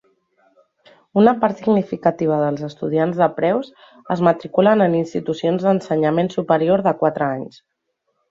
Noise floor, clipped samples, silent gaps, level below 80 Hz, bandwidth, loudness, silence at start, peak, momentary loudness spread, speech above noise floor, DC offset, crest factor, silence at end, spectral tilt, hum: -72 dBFS; under 0.1%; none; -62 dBFS; 7.6 kHz; -18 LUFS; 1.15 s; -2 dBFS; 8 LU; 54 dB; under 0.1%; 18 dB; 0.8 s; -8 dB/octave; none